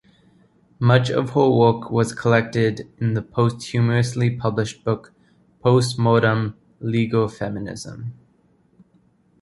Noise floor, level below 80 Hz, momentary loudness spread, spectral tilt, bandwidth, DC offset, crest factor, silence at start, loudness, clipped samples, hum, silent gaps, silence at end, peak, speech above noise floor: -59 dBFS; -52 dBFS; 12 LU; -6.5 dB/octave; 11.5 kHz; under 0.1%; 20 dB; 0.8 s; -20 LUFS; under 0.1%; none; none; 1.3 s; -2 dBFS; 40 dB